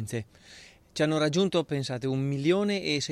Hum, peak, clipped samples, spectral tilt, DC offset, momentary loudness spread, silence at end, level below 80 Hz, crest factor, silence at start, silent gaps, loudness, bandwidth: none; -12 dBFS; under 0.1%; -5.5 dB/octave; under 0.1%; 12 LU; 0 s; -64 dBFS; 16 dB; 0 s; none; -28 LUFS; 13.5 kHz